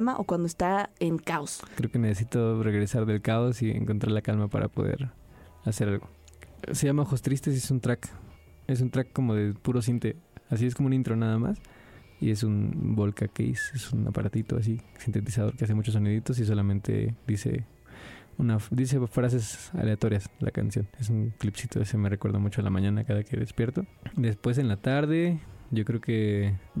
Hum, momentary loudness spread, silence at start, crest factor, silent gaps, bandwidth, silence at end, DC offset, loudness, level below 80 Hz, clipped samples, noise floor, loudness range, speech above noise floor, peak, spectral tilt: none; 7 LU; 0 s; 14 dB; none; 14 kHz; 0 s; under 0.1%; -28 LUFS; -52 dBFS; under 0.1%; -47 dBFS; 2 LU; 20 dB; -14 dBFS; -7 dB/octave